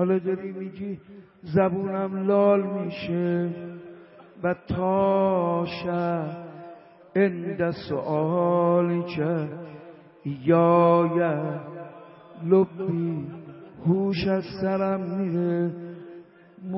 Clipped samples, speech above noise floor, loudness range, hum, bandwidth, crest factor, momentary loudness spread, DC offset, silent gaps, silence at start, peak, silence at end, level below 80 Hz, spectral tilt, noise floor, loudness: under 0.1%; 23 dB; 4 LU; none; 5.8 kHz; 18 dB; 19 LU; under 0.1%; none; 0 s; -6 dBFS; 0 s; -60 dBFS; -11.5 dB/octave; -47 dBFS; -25 LUFS